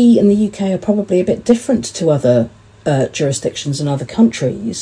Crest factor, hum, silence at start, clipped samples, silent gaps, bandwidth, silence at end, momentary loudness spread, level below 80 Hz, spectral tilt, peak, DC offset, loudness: 14 dB; none; 0 s; under 0.1%; none; 10.5 kHz; 0 s; 7 LU; -48 dBFS; -6 dB/octave; 0 dBFS; under 0.1%; -16 LUFS